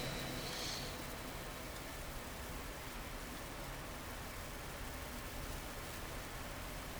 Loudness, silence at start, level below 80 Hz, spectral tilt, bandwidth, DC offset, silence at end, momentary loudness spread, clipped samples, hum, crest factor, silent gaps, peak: -45 LUFS; 0 s; -52 dBFS; -3.5 dB/octave; over 20 kHz; under 0.1%; 0 s; 5 LU; under 0.1%; none; 16 dB; none; -30 dBFS